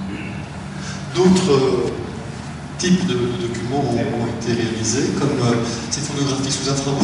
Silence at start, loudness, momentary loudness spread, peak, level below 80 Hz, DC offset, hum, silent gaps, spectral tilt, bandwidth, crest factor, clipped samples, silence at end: 0 s; -20 LUFS; 14 LU; -2 dBFS; -42 dBFS; under 0.1%; none; none; -5 dB/octave; 11 kHz; 18 dB; under 0.1%; 0 s